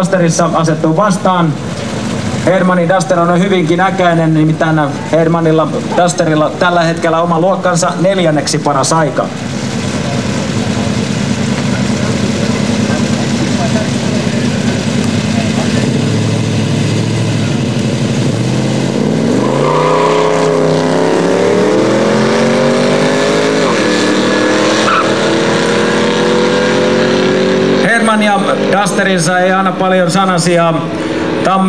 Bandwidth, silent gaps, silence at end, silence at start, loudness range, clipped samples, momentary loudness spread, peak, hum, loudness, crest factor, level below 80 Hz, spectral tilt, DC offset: 11 kHz; none; 0 s; 0 s; 3 LU; under 0.1%; 4 LU; 0 dBFS; none; -11 LUFS; 12 dB; -42 dBFS; -5.5 dB/octave; 2%